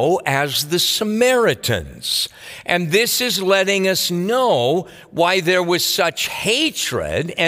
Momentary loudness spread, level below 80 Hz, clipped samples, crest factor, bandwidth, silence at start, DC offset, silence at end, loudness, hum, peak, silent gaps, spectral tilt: 6 LU; -50 dBFS; under 0.1%; 18 dB; 16 kHz; 0 s; under 0.1%; 0 s; -17 LUFS; none; 0 dBFS; none; -3 dB/octave